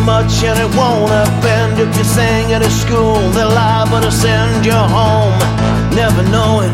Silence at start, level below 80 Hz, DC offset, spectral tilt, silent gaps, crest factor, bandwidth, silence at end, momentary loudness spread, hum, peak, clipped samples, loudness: 0 s; -24 dBFS; under 0.1%; -5.5 dB/octave; none; 10 dB; 16 kHz; 0 s; 2 LU; none; 0 dBFS; under 0.1%; -12 LUFS